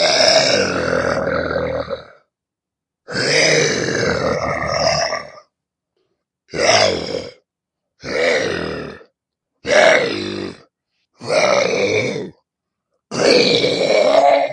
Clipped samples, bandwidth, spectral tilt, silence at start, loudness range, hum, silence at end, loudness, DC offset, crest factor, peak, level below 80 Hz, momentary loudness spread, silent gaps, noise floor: under 0.1%; 11 kHz; -3 dB/octave; 0 s; 3 LU; none; 0 s; -16 LUFS; under 0.1%; 18 dB; 0 dBFS; -50 dBFS; 16 LU; none; -84 dBFS